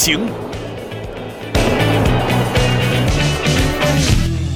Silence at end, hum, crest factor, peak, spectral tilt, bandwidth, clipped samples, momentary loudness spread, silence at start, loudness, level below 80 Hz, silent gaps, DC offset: 0 s; none; 14 dB; -2 dBFS; -4.5 dB/octave; 16.5 kHz; under 0.1%; 13 LU; 0 s; -16 LUFS; -24 dBFS; none; under 0.1%